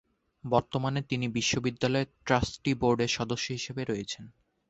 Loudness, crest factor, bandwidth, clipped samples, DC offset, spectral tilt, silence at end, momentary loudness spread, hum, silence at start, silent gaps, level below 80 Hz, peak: -30 LUFS; 22 dB; 8.2 kHz; under 0.1%; under 0.1%; -4.5 dB/octave; 0.4 s; 7 LU; none; 0.45 s; none; -52 dBFS; -8 dBFS